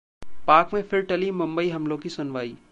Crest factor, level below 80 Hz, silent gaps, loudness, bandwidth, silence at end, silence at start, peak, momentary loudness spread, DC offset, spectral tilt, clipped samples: 20 dB; -56 dBFS; none; -24 LUFS; 9.2 kHz; 0 s; 0.2 s; -4 dBFS; 12 LU; under 0.1%; -6.5 dB/octave; under 0.1%